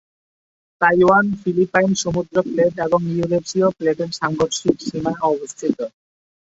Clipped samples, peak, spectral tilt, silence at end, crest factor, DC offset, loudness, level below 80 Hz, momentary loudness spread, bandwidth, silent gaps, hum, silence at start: under 0.1%; -2 dBFS; -5 dB/octave; 0.7 s; 18 dB; under 0.1%; -19 LUFS; -52 dBFS; 9 LU; 8 kHz; none; none; 0.8 s